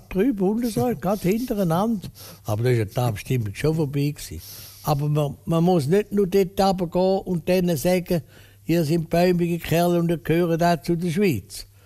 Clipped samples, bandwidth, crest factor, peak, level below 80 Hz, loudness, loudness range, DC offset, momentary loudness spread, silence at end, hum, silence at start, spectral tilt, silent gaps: under 0.1%; 15.5 kHz; 14 dB; -8 dBFS; -46 dBFS; -22 LUFS; 3 LU; under 0.1%; 9 LU; 0.2 s; none; 0.1 s; -7 dB/octave; none